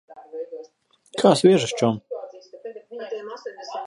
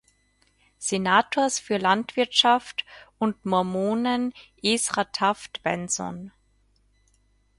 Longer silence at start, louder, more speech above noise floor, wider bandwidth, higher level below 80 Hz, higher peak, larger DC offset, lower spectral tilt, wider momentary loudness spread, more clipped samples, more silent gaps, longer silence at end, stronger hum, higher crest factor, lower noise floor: second, 0.1 s vs 0.8 s; first, -20 LUFS vs -24 LUFS; second, 36 dB vs 41 dB; about the same, 11.5 kHz vs 11.5 kHz; about the same, -68 dBFS vs -64 dBFS; about the same, -2 dBFS vs -4 dBFS; neither; first, -5.5 dB/octave vs -3 dB/octave; first, 23 LU vs 10 LU; neither; neither; second, 0 s vs 1.3 s; neither; about the same, 22 dB vs 22 dB; second, -55 dBFS vs -65 dBFS